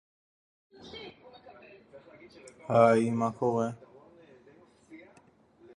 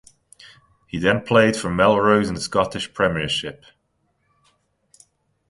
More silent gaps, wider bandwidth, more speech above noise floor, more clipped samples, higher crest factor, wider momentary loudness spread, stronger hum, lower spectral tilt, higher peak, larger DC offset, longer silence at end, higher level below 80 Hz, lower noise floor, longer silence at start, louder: neither; about the same, 10.5 kHz vs 11.5 kHz; second, 36 dB vs 50 dB; neither; about the same, 24 dB vs 20 dB; first, 26 LU vs 9 LU; neither; first, -7 dB/octave vs -5 dB/octave; second, -8 dBFS vs -2 dBFS; neither; second, 0.8 s vs 1.95 s; second, -70 dBFS vs -48 dBFS; second, -61 dBFS vs -69 dBFS; about the same, 0.85 s vs 0.95 s; second, -27 LUFS vs -19 LUFS